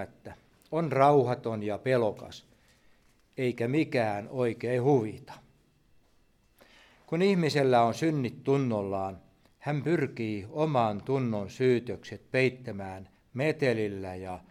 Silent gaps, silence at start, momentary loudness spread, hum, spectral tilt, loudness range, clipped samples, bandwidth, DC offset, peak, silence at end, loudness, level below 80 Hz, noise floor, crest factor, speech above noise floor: none; 0 s; 16 LU; none; -7 dB/octave; 3 LU; under 0.1%; 14 kHz; under 0.1%; -8 dBFS; 0.1 s; -29 LUFS; -68 dBFS; -66 dBFS; 22 dB; 38 dB